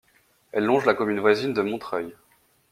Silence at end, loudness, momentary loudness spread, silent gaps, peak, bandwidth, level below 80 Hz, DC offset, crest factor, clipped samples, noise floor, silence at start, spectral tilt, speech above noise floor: 0.6 s; -24 LUFS; 10 LU; none; -4 dBFS; 14.5 kHz; -66 dBFS; under 0.1%; 22 dB; under 0.1%; -62 dBFS; 0.55 s; -6 dB/octave; 39 dB